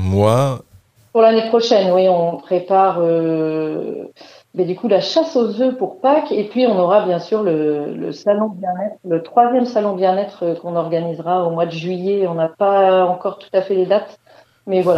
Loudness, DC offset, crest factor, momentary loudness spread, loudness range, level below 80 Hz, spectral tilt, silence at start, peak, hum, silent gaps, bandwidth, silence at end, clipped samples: -17 LUFS; under 0.1%; 16 dB; 9 LU; 3 LU; -64 dBFS; -7 dB/octave; 0 s; 0 dBFS; none; none; 12.5 kHz; 0 s; under 0.1%